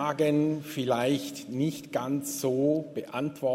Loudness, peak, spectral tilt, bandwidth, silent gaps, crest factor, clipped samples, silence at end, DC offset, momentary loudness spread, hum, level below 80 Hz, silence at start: -29 LUFS; -12 dBFS; -5.5 dB/octave; 16 kHz; none; 16 dB; under 0.1%; 0 s; under 0.1%; 8 LU; none; -70 dBFS; 0 s